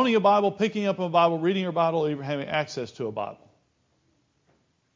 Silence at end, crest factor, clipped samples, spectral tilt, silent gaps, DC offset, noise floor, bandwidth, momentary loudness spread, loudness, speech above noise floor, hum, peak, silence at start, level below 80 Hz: 1.6 s; 18 dB; under 0.1%; -6.5 dB/octave; none; under 0.1%; -69 dBFS; 7.6 kHz; 12 LU; -25 LUFS; 45 dB; none; -8 dBFS; 0 s; -70 dBFS